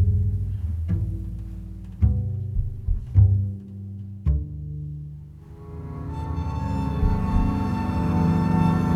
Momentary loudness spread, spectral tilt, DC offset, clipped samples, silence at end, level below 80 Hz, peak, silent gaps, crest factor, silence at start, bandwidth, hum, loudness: 16 LU; -9.5 dB/octave; under 0.1%; under 0.1%; 0 s; -30 dBFS; -6 dBFS; none; 18 dB; 0 s; 6.6 kHz; none; -25 LUFS